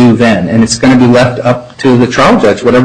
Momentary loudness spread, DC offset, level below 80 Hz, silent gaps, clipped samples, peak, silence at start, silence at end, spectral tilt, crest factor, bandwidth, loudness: 5 LU; under 0.1%; -36 dBFS; none; 0.2%; 0 dBFS; 0 s; 0 s; -5.5 dB/octave; 6 dB; 10 kHz; -7 LUFS